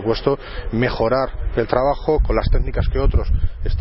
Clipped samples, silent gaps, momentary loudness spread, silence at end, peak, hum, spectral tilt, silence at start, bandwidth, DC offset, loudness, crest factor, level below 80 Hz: under 0.1%; none; 5 LU; 0 s; 0 dBFS; none; -11 dB/octave; 0 s; 5.8 kHz; under 0.1%; -20 LUFS; 18 dB; -22 dBFS